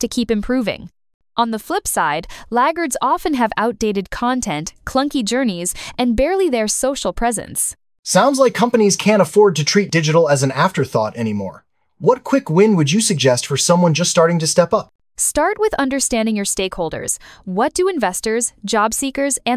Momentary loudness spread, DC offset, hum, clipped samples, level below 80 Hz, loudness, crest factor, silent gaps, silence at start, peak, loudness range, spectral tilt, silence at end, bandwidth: 9 LU; under 0.1%; none; under 0.1%; -42 dBFS; -17 LUFS; 16 dB; 1.14-1.20 s, 7.99-8.03 s, 14.95-14.99 s; 0 s; 0 dBFS; 4 LU; -4 dB/octave; 0 s; 16 kHz